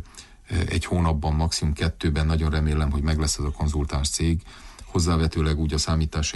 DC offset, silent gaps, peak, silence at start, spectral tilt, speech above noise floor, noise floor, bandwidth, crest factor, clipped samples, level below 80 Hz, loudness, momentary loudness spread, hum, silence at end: under 0.1%; none; -12 dBFS; 0 s; -5 dB/octave; 22 dB; -45 dBFS; 11.5 kHz; 12 dB; under 0.1%; -28 dBFS; -24 LUFS; 5 LU; none; 0 s